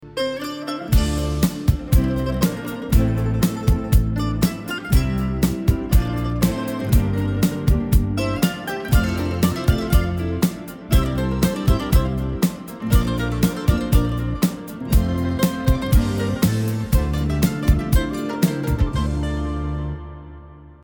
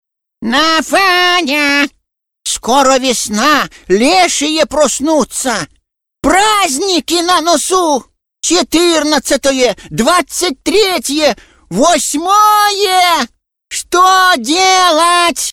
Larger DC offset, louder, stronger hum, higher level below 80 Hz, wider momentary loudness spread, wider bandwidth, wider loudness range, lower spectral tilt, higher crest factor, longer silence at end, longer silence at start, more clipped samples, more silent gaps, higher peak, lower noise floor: second, under 0.1% vs 0.3%; second, -21 LUFS vs -11 LUFS; neither; first, -24 dBFS vs -42 dBFS; second, 6 LU vs 9 LU; first, over 20 kHz vs 17.5 kHz; about the same, 1 LU vs 2 LU; first, -6.5 dB/octave vs -1.5 dB/octave; about the same, 16 dB vs 12 dB; about the same, 0.1 s vs 0 s; second, 0 s vs 0.4 s; neither; neither; second, -4 dBFS vs 0 dBFS; about the same, -41 dBFS vs -44 dBFS